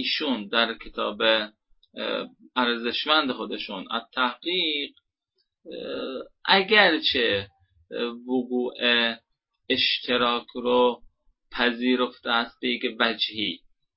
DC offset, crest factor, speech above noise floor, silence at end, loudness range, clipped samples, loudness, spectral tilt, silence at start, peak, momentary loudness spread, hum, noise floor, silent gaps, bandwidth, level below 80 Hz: under 0.1%; 24 dB; 51 dB; 0.4 s; 4 LU; under 0.1%; -24 LUFS; -7.5 dB/octave; 0 s; -2 dBFS; 12 LU; none; -76 dBFS; none; 5.8 kHz; -62 dBFS